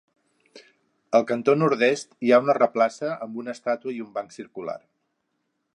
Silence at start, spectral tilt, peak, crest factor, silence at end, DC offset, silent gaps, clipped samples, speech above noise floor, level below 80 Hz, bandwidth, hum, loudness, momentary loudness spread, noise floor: 0.55 s; -5.5 dB/octave; -4 dBFS; 20 dB; 1 s; under 0.1%; none; under 0.1%; 53 dB; -78 dBFS; 11 kHz; none; -23 LUFS; 15 LU; -76 dBFS